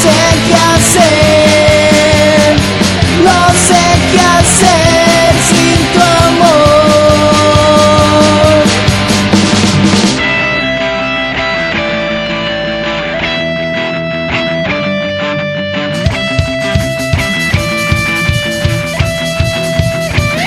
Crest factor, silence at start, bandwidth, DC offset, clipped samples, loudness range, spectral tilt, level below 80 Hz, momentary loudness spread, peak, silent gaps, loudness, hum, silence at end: 8 dB; 0 s; 18.5 kHz; under 0.1%; 1%; 7 LU; -4 dB/octave; -26 dBFS; 8 LU; 0 dBFS; none; -9 LUFS; none; 0 s